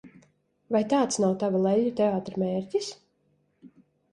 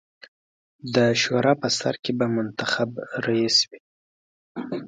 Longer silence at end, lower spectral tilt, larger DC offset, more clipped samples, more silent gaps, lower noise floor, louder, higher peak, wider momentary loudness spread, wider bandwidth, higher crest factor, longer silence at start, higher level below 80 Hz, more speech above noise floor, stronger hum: first, 0.45 s vs 0 s; first, -5.5 dB/octave vs -4 dB/octave; neither; neither; second, none vs 3.80-4.55 s; second, -70 dBFS vs under -90 dBFS; second, -26 LUFS vs -23 LUFS; second, -12 dBFS vs -6 dBFS; second, 7 LU vs 12 LU; first, 11.5 kHz vs 9.4 kHz; about the same, 16 dB vs 20 dB; second, 0.05 s vs 0.85 s; about the same, -68 dBFS vs -66 dBFS; second, 45 dB vs over 67 dB; neither